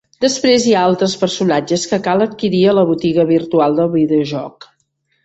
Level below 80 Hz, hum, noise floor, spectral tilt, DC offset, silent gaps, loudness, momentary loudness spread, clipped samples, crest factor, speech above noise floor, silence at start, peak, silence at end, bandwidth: -54 dBFS; none; -65 dBFS; -5 dB/octave; under 0.1%; none; -14 LUFS; 5 LU; under 0.1%; 14 dB; 51 dB; 0.2 s; -2 dBFS; 0.75 s; 8.2 kHz